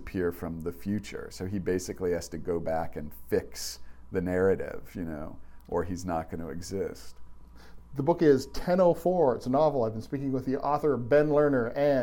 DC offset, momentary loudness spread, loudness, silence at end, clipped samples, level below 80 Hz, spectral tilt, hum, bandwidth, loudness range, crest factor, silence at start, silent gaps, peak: under 0.1%; 14 LU; -29 LUFS; 0 s; under 0.1%; -48 dBFS; -6.5 dB/octave; none; 17.5 kHz; 7 LU; 18 dB; 0 s; none; -10 dBFS